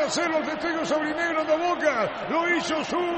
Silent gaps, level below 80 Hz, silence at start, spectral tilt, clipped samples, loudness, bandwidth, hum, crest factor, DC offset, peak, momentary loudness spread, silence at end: none; -60 dBFS; 0 s; -3.5 dB/octave; under 0.1%; -25 LUFS; 8.8 kHz; none; 16 dB; under 0.1%; -10 dBFS; 3 LU; 0 s